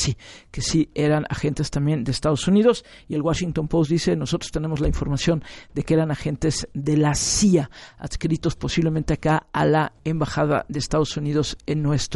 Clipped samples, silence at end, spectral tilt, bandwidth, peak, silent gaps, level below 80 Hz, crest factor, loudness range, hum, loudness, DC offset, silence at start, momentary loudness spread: under 0.1%; 0 s; -5.5 dB/octave; 11.5 kHz; -4 dBFS; none; -38 dBFS; 18 dB; 2 LU; none; -22 LUFS; under 0.1%; 0 s; 8 LU